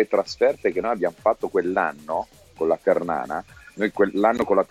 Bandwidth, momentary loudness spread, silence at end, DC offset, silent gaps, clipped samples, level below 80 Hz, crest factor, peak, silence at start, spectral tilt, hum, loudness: 14.5 kHz; 9 LU; 0.05 s; under 0.1%; none; under 0.1%; -56 dBFS; 18 dB; -6 dBFS; 0 s; -6 dB/octave; none; -23 LUFS